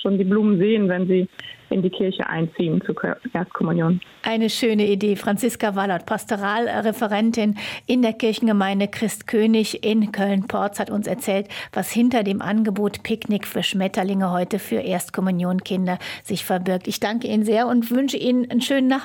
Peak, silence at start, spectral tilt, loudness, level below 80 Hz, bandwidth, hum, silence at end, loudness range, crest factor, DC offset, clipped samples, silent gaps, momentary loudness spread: -10 dBFS; 0 s; -5.5 dB/octave; -22 LUFS; -62 dBFS; 17 kHz; none; 0 s; 2 LU; 12 dB; under 0.1%; under 0.1%; none; 6 LU